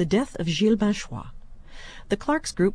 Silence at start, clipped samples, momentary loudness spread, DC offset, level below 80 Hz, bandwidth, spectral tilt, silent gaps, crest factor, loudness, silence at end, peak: 0 s; under 0.1%; 22 LU; under 0.1%; -42 dBFS; 10.5 kHz; -5.5 dB/octave; none; 16 dB; -24 LUFS; 0 s; -10 dBFS